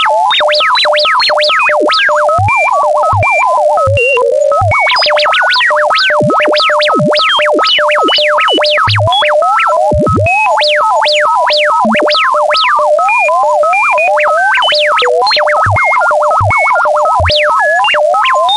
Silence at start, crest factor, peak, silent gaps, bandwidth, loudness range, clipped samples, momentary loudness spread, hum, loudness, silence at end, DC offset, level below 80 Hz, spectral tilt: 0 s; 8 dB; 0 dBFS; none; 11.5 kHz; 1 LU; under 0.1%; 2 LU; none; -8 LUFS; 0 s; 0.2%; -38 dBFS; -4 dB/octave